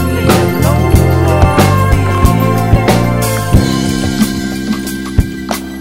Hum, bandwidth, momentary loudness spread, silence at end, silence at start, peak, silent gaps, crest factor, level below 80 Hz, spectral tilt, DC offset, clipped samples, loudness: none; 16.5 kHz; 8 LU; 0 s; 0 s; 0 dBFS; none; 10 dB; -20 dBFS; -6 dB/octave; 2%; 0.6%; -12 LUFS